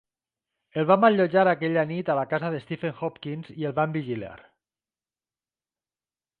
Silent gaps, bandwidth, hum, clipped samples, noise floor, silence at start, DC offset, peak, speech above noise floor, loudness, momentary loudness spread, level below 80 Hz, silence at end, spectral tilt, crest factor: none; 4.7 kHz; none; under 0.1%; under -90 dBFS; 0.75 s; under 0.1%; -6 dBFS; over 66 dB; -25 LUFS; 15 LU; -68 dBFS; 2.05 s; -9.5 dB/octave; 20 dB